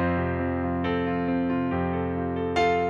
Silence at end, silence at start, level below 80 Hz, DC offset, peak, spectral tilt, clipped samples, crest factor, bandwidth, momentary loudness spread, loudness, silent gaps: 0 s; 0 s; -50 dBFS; under 0.1%; -10 dBFS; -7.5 dB/octave; under 0.1%; 16 dB; 7.2 kHz; 3 LU; -26 LUFS; none